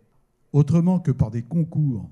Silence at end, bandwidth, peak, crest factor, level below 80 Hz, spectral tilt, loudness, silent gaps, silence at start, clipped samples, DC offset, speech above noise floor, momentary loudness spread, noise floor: 0 s; 7.6 kHz; -6 dBFS; 16 dB; -46 dBFS; -10 dB/octave; -22 LUFS; none; 0.55 s; under 0.1%; under 0.1%; 42 dB; 6 LU; -63 dBFS